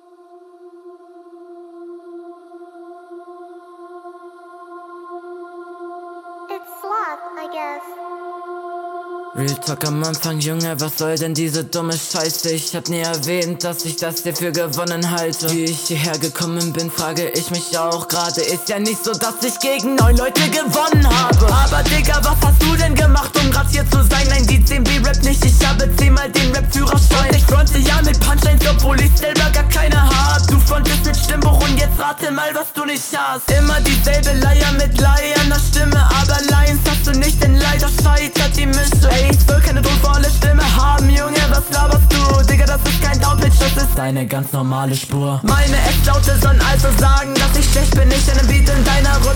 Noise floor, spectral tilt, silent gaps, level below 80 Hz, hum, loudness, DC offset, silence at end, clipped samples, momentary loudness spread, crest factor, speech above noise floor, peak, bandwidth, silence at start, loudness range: -44 dBFS; -4.5 dB/octave; none; -16 dBFS; none; -15 LUFS; under 0.1%; 0 s; under 0.1%; 12 LU; 12 dB; 31 dB; -2 dBFS; 18.5 kHz; 0.65 s; 11 LU